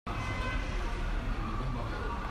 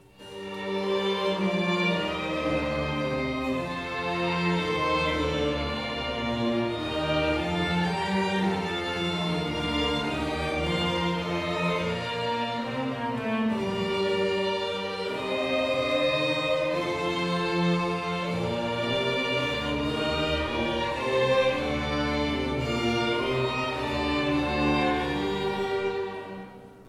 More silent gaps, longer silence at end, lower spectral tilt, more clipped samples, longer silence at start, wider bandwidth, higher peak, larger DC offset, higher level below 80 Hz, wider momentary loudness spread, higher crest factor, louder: neither; about the same, 0 s vs 0 s; about the same, -6 dB/octave vs -5.5 dB/octave; neither; second, 0.05 s vs 0.2 s; second, 10.5 kHz vs 14 kHz; second, -22 dBFS vs -12 dBFS; neither; first, -36 dBFS vs -44 dBFS; second, 2 LU vs 5 LU; about the same, 12 dB vs 16 dB; second, -36 LUFS vs -27 LUFS